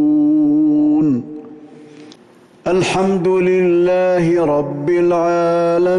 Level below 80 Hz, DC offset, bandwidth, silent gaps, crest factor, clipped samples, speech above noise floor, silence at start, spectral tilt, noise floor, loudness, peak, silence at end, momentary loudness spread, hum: -52 dBFS; under 0.1%; 11 kHz; none; 8 dB; under 0.1%; 32 dB; 0 s; -7 dB/octave; -46 dBFS; -15 LUFS; -8 dBFS; 0 s; 5 LU; none